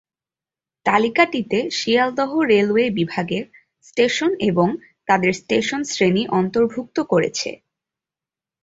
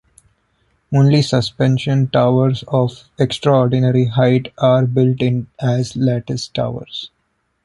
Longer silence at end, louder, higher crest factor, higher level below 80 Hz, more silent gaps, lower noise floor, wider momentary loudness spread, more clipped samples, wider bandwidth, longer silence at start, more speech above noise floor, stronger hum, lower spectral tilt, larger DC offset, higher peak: first, 1.1 s vs 0.6 s; second, -19 LUFS vs -16 LUFS; about the same, 18 dB vs 14 dB; second, -58 dBFS vs -50 dBFS; neither; first, under -90 dBFS vs -67 dBFS; about the same, 9 LU vs 9 LU; neither; second, 7.8 kHz vs 11 kHz; about the same, 0.85 s vs 0.9 s; first, over 71 dB vs 52 dB; neither; second, -5 dB/octave vs -7.5 dB/octave; neither; about the same, -2 dBFS vs -2 dBFS